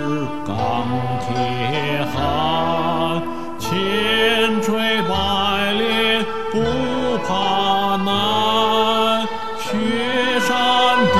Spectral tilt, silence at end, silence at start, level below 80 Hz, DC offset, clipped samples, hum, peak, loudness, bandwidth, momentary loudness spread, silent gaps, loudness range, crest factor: -4.5 dB/octave; 0 s; 0 s; -42 dBFS; 3%; under 0.1%; none; -4 dBFS; -18 LUFS; 15 kHz; 7 LU; none; 3 LU; 16 dB